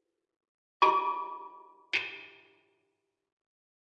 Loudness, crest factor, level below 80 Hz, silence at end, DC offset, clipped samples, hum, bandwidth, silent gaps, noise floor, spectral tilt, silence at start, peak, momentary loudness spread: -30 LUFS; 26 dB; -86 dBFS; 1.65 s; under 0.1%; under 0.1%; none; 8.2 kHz; none; -81 dBFS; -2.5 dB/octave; 0.8 s; -10 dBFS; 21 LU